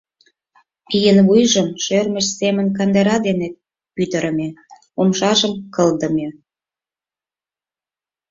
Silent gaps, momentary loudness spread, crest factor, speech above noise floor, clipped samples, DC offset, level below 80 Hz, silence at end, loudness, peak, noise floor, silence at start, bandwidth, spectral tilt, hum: none; 12 LU; 16 dB; over 74 dB; under 0.1%; under 0.1%; -56 dBFS; 2 s; -17 LUFS; -2 dBFS; under -90 dBFS; 0.9 s; 7.6 kHz; -4.5 dB/octave; none